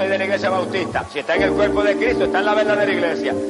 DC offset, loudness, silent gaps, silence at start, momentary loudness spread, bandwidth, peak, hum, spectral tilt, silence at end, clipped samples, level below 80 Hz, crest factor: under 0.1%; -18 LUFS; none; 0 s; 5 LU; 11.5 kHz; -4 dBFS; none; -5 dB/octave; 0 s; under 0.1%; -44 dBFS; 14 dB